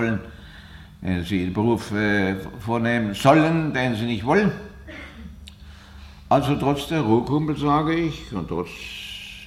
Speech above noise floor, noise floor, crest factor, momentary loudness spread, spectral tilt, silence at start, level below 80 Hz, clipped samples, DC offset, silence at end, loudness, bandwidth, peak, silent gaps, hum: 22 dB; -43 dBFS; 18 dB; 20 LU; -6.5 dB/octave; 0 s; -44 dBFS; under 0.1%; under 0.1%; 0 s; -22 LUFS; 15.5 kHz; -4 dBFS; none; none